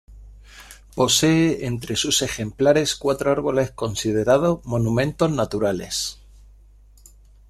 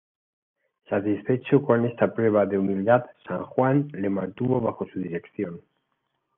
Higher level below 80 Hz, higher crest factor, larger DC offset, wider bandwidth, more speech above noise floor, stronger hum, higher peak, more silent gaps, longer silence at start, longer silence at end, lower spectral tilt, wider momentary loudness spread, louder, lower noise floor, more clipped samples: first, -46 dBFS vs -66 dBFS; about the same, 18 dB vs 20 dB; neither; first, 14.5 kHz vs 3.8 kHz; second, 29 dB vs 52 dB; neither; about the same, -4 dBFS vs -6 dBFS; neither; second, 0.1 s vs 0.9 s; first, 1.35 s vs 0.8 s; second, -4.5 dB/octave vs -11.5 dB/octave; second, 8 LU vs 12 LU; first, -21 LUFS vs -25 LUFS; second, -49 dBFS vs -76 dBFS; neither